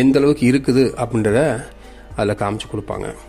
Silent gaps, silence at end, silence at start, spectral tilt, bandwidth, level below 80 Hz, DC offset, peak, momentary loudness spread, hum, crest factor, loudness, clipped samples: none; 0.05 s; 0 s; -6.5 dB/octave; 14.5 kHz; -40 dBFS; under 0.1%; -2 dBFS; 13 LU; none; 16 dB; -18 LUFS; under 0.1%